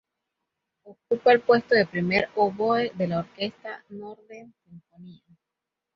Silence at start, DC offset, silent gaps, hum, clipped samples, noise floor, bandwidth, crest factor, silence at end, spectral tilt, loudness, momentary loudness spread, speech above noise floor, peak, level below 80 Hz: 0.85 s; under 0.1%; none; none; under 0.1%; -86 dBFS; 6.4 kHz; 22 dB; 0.85 s; -7.5 dB/octave; -23 LUFS; 21 LU; 61 dB; -4 dBFS; -64 dBFS